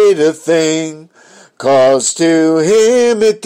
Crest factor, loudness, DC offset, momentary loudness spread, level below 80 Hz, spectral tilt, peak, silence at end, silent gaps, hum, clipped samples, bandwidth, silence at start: 10 dB; -11 LUFS; under 0.1%; 7 LU; -60 dBFS; -4 dB/octave; -2 dBFS; 0 s; none; none; under 0.1%; 15.5 kHz; 0 s